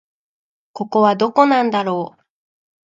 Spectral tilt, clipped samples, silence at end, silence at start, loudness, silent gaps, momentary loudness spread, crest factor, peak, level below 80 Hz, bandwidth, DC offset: -6.5 dB/octave; under 0.1%; 0.8 s; 0.75 s; -16 LUFS; none; 14 LU; 18 dB; 0 dBFS; -70 dBFS; 7.6 kHz; under 0.1%